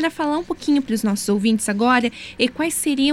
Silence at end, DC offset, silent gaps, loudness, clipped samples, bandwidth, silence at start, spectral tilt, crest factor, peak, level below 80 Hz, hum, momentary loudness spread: 0 s; under 0.1%; none; -20 LUFS; under 0.1%; 16 kHz; 0 s; -3.5 dB/octave; 16 dB; -2 dBFS; -52 dBFS; none; 6 LU